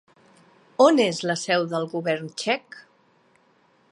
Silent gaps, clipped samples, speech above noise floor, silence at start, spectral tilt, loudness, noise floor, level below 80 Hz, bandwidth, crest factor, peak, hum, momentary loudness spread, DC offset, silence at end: none; under 0.1%; 39 dB; 0.8 s; -4.5 dB/octave; -23 LUFS; -61 dBFS; -76 dBFS; 11.5 kHz; 22 dB; -4 dBFS; none; 10 LU; under 0.1%; 1.1 s